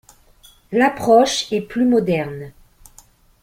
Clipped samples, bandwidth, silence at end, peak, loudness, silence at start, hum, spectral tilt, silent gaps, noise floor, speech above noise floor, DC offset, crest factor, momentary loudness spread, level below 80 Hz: under 0.1%; 16 kHz; 0.95 s; -2 dBFS; -17 LUFS; 0.7 s; none; -4.5 dB/octave; none; -50 dBFS; 34 dB; under 0.1%; 18 dB; 15 LU; -52 dBFS